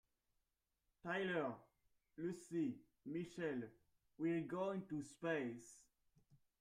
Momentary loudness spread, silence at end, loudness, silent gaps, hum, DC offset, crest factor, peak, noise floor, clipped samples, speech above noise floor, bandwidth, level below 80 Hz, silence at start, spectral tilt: 14 LU; 0.25 s; -45 LUFS; none; none; under 0.1%; 20 dB; -28 dBFS; -89 dBFS; under 0.1%; 44 dB; 11 kHz; -82 dBFS; 1.05 s; -6 dB/octave